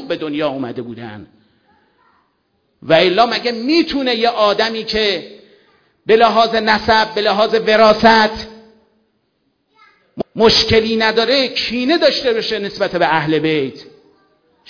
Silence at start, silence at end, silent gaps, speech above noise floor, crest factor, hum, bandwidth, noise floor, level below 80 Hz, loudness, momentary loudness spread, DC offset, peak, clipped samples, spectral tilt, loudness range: 0 s; 0.85 s; none; 51 dB; 16 dB; none; 5.4 kHz; -65 dBFS; -46 dBFS; -14 LUFS; 15 LU; under 0.1%; 0 dBFS; under 0.1%; -4.5 dB/octave; 4 LU